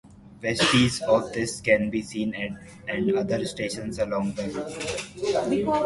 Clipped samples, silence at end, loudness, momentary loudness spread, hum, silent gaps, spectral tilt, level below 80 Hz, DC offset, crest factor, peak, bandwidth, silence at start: under 0.1%; 0 s; -26 LUFS; 11 LU; none; none; -4.5 dB/octave; -52 dBFS; under 0.1%; 20 dB; -6 dBFS; 11.5 kHz; 0.05 s